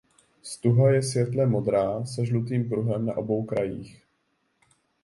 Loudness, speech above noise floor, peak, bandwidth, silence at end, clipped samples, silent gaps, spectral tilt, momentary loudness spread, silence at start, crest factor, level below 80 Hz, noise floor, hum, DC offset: -25 LUFS; 48 dB; -10 dBFS; 11.5 kHz; 1.1 s; under 0.1%; none; -7 dB/octave; 9 LU; 0.45 s; 16 dB; -60 dBFS; -72 dBFS; none; under 0.1%